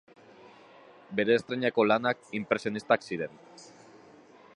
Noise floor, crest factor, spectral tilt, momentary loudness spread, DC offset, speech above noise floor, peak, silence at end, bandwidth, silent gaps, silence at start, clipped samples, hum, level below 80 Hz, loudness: -55 dBFS; 24 dB; -5.5 dB/octave; 13 LU; under 0.1%; 27 dB; -8 dBFS; 0.9 s; 11 kHz; none; 1.1 s; under 0.1%; none; -74 dBFS; -28 LUFS